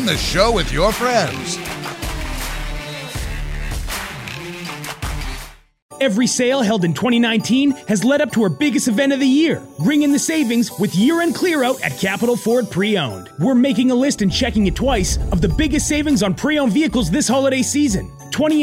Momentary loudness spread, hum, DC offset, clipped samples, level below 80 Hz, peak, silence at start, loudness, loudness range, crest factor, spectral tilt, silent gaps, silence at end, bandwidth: 11 LU; none; under 0.1%; under 0.1%; -30 dBFS; -2 dBFS; 0 s; -18 LUFS; 10 LU; 16 dB; -4.5 dB/octave; 5.82-5.89 s; 0 s; 16 kHz